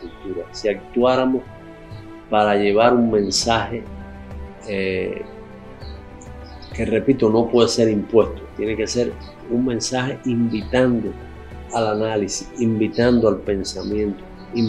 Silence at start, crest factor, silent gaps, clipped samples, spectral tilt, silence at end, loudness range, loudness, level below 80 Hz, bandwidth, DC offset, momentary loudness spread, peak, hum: 0 s; 20 dB; none; under 0.1%; -5 dB/octave; 0 s; 5 LU; -20 LUFS; -42 dBFS; 12 kHz; under 0.1%; 21 LU; 0 dBFS; none